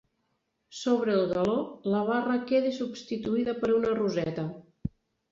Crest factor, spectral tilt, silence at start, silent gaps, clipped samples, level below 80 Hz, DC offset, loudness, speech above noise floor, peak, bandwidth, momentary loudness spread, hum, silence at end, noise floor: 16 dB; -6.5 dB/octave; 0.7 s; none; under 0.1%; -58 dBFS; under 0.1%; -28 LUFS; 49 dB; -14 dBFS; 7.8 kHz; 13 LU; none; 0.4 s; -77 dBFS